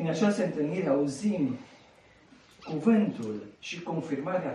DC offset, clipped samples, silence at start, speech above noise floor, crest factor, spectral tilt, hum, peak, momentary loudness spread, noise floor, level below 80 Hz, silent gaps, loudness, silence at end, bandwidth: under 0.1%; under 0.1%; 0 s; 29 dB; 18 dB; -6.5 dB/octave; none; -12 dBFS; 13 LU; -58 dBFS; -70 dBFS; none; -29 LUFS; 0 s; 11.5 kHz